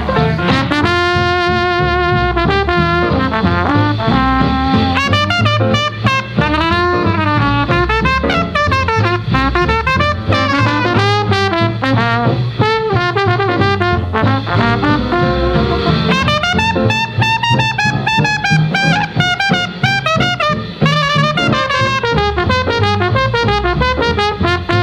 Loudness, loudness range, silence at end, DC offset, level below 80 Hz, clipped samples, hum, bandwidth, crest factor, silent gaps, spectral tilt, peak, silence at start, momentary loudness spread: -13 LUFS; 1 LU; 0 s; under 0.1%; -28 dBFS; under 0.1%; none; 10.5 kHz; 12 dB; none; -6 dB/octave; 0 dBFS; 0 s; 2 LU